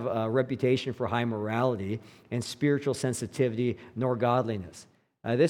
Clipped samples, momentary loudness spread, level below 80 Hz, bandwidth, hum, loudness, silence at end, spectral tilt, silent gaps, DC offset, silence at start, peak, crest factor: under 0.1%; 9 LU; -70 dBFS; 15.5 kHz; none; -29 LUFS; 0 s; -6.5 dB/octave; none; under 0.1%; 0 s; -12 dBFS; 18 dB